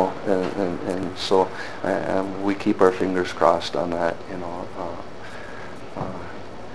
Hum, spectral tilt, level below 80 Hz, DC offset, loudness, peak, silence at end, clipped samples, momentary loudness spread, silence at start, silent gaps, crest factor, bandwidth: none; -5.5 dB/octave; -54 dBFS; 2%; -24 LUFS; 0 dBFS; 0 s; under 0.1%; 17 LU; 0 s; none; 24 dB; 11 kHz